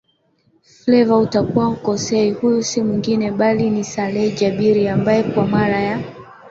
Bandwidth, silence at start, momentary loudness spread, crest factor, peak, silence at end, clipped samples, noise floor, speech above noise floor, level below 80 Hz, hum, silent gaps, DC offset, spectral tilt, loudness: 7.8 kHz; 0.85 s; 6 LU; 14 dB; -2 dBFS; 0 s; under 0.1%; -61 dBFS; 45 dB; -50 dBFS; none; none; under 0.1%; -6 dB/octave; -17 LUFS